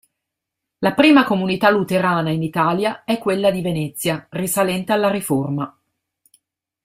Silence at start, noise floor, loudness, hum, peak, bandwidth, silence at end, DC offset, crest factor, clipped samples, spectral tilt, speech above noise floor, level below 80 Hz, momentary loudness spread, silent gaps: 0.8 s; -82 dBFS; -18 LUFS; none; -2 dBFS; 16 kHz; 1.15 s; under 0.1%; 18 dB; under 0.1%; -5 dB/octave; 64 dB; -56 dBFS; 10 LU; none